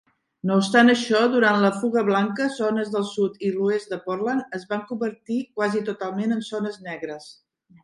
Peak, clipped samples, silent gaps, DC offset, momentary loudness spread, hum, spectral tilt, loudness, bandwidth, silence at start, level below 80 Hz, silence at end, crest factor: -2 dBFS; under 0.1%; none; under 0.1%; 12 LU; none; -5.5 dB/octave; -23 LUFS; 11.5 kHz; 0.45 s; -70 dBFS; 0.5 s; 20 dB